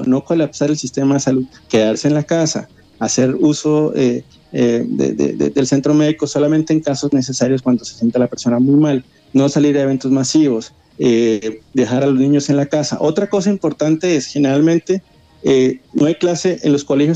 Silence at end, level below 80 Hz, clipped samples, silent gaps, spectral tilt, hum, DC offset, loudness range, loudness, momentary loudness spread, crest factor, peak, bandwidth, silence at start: 0 s; -54 dBFS; under 0.1%; none; -6 dB/octave; none; under 0.1%; 1 LU; -16 LUFS; 5 LU; 14 dB; -2 dBFS; 9 kHz; 0 s